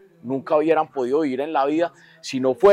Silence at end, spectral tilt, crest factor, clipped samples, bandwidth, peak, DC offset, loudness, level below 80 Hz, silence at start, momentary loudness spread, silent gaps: 0 s; -5.5 dB/octave; 16 dB; under 0.1%; 11.5 kHz; -6 dBFS; under 0.1%; -22 LUFS; -62 dBFS; 0.25 s; 11 LU; none